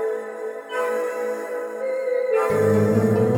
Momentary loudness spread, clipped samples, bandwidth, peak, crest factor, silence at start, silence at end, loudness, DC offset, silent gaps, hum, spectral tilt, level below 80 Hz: 11 LU; under 0.1%; 18 kHz; -8 dBFS; 14 dB; 0 s; 0 s; -23 LUFS; under 0.1%; none; none; -7.5 dB/octave; -60 dBFS